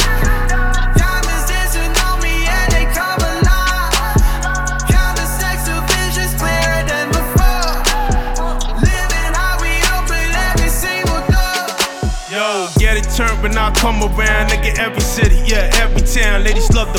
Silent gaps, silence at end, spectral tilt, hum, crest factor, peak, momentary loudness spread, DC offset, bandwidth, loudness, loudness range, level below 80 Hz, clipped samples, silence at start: none; 0 s; -3.5 dB/octave; none; 12 dB; 0 dBFS; 3 LU; 0.5%; 18 kHz; -15 LUFS; 2 LU; -16 dBFS; under 0.1%; 0 s